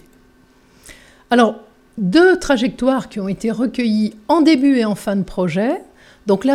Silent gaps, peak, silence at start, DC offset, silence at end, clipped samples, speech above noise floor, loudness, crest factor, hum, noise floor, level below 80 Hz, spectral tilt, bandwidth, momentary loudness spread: none; 0 dBFS; 0.9 s; under 0.1%; 0 s; under 0.1%; 36 dB; -17 LUFS; 16 dB; none; -51 dBFS; -46 dBFS; -6 dB/octave; 14 kHz; 11 LU